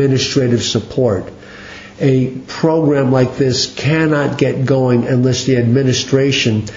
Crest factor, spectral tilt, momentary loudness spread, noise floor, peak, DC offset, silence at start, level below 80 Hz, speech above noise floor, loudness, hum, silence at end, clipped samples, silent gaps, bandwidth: 14 dB; -5.5 dB/octave; 7 LU; -34 dBFS; 0 dBFS; under 0.1%; 0 s; -46 dBFS; 20 dB; -14 LUFS; none; 0 s; under 0.1%; none; 7.6 kHz